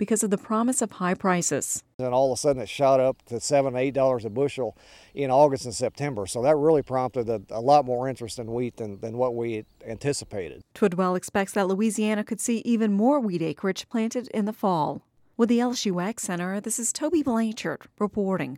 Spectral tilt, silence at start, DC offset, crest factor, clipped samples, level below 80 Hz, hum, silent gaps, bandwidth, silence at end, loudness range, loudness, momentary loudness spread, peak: -5 dB/octave; 0 s; under 0.1%; 18 dB; under 0.1%; -60 dBFS; none; 1.94-1.99 s; 16 kHz; 0 s; 3 LU; -25 LUFS; 11 LU; -8 dBFS